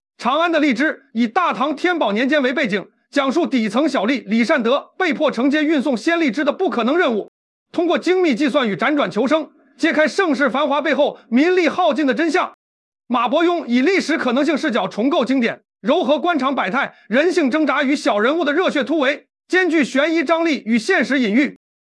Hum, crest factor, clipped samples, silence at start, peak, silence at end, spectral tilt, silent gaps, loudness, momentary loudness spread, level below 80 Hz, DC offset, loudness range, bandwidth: none; 14 dB; under 0.1%; 0.2 s; -4 dBFS; 0.4 s; -4.5 dB/octave; 7.28-7.66 s, 12.54-12.92 s; -18 LUFS; 4 LU; -72 dBFS; under 0.1%; 1 LU; 11.5 kHz